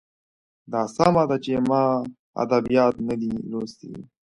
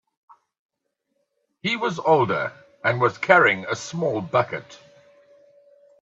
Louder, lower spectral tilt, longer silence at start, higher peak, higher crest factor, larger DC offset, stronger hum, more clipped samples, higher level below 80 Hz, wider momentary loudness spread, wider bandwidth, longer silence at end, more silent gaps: about the same, -23 LUFS vs -21 LUFS; first, -7 dB/octave vs -5 dB/octave; second, 0.7 s vs 1.65 s; second, -4 dBFS vs 0 dBFS; about the same, 20 dB vs 24 dB; neither; neither; neither; first, -56 dBFS vs -68 dBFS; about the same, 14 LU vs 13 LU; first, 11 kHz vs 8 kHz; second, 0.2 s vs 1.25 s; first, 2.19-2.33 s vs none